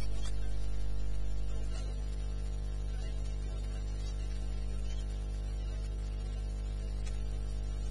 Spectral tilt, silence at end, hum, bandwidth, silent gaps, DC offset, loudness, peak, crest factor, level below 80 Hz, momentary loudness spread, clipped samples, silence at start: -6 dB/octave; 0 s; 50 Hz at -35 dBFS; 11 kHz; none; under 0.1%; -40 LUFS; -24 dBFS; 8 dB; -36 dBFS; 0 LU; under 0.1%; 0 s